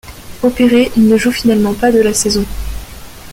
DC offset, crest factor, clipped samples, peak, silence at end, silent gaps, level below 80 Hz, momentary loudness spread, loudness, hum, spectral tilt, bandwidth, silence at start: under 0.1%; 12 dB; under 0.1%; -2 dBFS; 0 s; none; -30 dBFS; 17 LU; -12 LUFS; none; -4.5 dB/octave; 16.5 kHz; 0.05 s